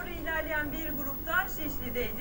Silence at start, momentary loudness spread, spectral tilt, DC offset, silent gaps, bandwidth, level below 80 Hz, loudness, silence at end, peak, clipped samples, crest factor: 0 s; 4 LU; -4.5 dB/octave; under 0.1%; none; 16.5 kHz; -44 dBFS; -32 LUFS; 0 s; -16 dBFS; under 0.1%; 16 dB